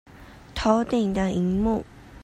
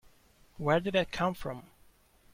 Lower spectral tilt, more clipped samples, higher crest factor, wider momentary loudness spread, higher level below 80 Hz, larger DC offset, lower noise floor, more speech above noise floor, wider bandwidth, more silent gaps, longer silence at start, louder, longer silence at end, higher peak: about the same, -7 dB/octave vs -6 dB/octave; neither; about the same, 20 dB vs 20 dB; second, 11 LU vs 14 LU; first, -42 dBFS vs -56 dBFS; neither; second, -44 dBFS vs -63 dBFS; second, 21 dB vs 32 dB; second, 11.5 kHz vs 16.5 kHz; neither; second, 0.2 s vs 0.6 s; first, -24 LUFS vs -31 LUFS; second, 0 s vs 0.7 s; first, -6 dBFS vs -14 dBFS